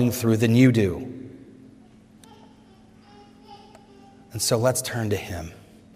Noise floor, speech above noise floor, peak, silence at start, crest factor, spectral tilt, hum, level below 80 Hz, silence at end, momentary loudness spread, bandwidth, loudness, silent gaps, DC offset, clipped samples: -52 dBFS; 30 dB; -4 dBFS; 0 s; 20 dB; -5.5 dB/octave; none; -56 dBFS; 0.4 s; 22 LU; 16 kHz; -22 LUFS; none; under 0.1%; under 0.1%